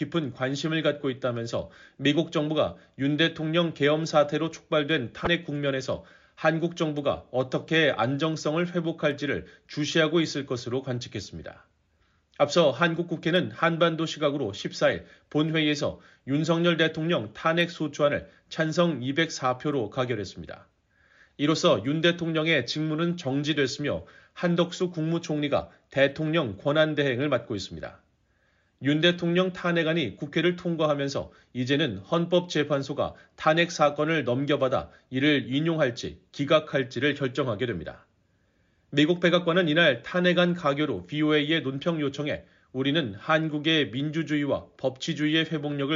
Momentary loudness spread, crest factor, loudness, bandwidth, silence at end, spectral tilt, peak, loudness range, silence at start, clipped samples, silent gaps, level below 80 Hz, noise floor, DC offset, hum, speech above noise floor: 10 LU; 18 dB; -26 LUFS; 7.4 kHz; 0 s; -4 dB/octave; -8 dBFS; 3 LU; 0 s; under 0.1%; none; -60 dBFS; -68 dBFS; under 0.1%; none; 42 dB